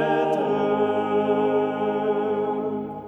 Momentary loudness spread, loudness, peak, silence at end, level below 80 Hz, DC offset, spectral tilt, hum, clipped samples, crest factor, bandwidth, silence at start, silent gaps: 4 LU; -23 LUFS; -10 dBFS; 0 s; -66 dBFS; under 0.1%; -7.5 dB/octave; none; under 0.1%; 12 dB; 6.6 kHz; 0 s; none